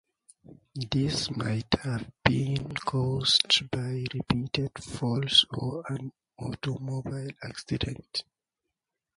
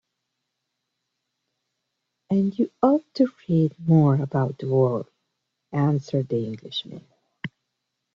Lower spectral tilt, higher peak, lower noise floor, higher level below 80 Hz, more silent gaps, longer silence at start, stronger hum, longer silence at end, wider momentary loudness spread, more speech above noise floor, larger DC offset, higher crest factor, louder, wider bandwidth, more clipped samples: second, -4.5 dB/octave vs -9 dB/octave; first, -2 dBFS vs -6 dBFS; first, -86 dBFS vs -80 dBFS; first, -52 dBFS vs -66 dBFS; neither; second, 0.5 s vs 2.3 s; neither; first, 0.95 s vs 0.65 s; second, 15 LU vs 19 LU; about the same, 57 dB vs 58 dB; neither; first, 28 dB vs 20 dB; second, -28 LUFS vs -23 LUFS; first, 11 kHz vs 7 kHz; neither